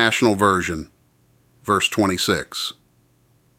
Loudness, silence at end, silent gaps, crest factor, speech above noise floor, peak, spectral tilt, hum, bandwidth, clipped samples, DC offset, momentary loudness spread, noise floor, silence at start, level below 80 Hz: -20 LUFS; 0.85 s; none; 20 dB; 40 dB; -2 dBFS; -4 dB/octave; none; 17 kHz; under 0.1%; under 0.1%; 14 LU; -59 dBFS; 0 s; -52 dBFS